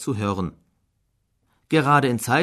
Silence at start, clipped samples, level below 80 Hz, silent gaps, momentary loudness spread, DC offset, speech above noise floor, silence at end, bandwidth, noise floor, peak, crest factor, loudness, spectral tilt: 0 s; under 0.1%; -56 dBFS; none; 11 LU; under 0.1%; 50 dB; 0 s; 13.5 kHz; -70 dBFS; -6 dBFS; 18 dB; -21 LUFS; -5.5 dB/octave